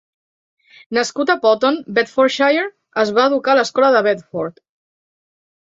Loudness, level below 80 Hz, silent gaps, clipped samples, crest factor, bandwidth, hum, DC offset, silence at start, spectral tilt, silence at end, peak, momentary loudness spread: -16 LUFS; -66 dBFS; none; under 0.1%; 16 dB; 7.8 kHz; none; under 0.1%; 0.9 s; -4 dB/octave; 1.15 s; -2 dBFS; 9 LU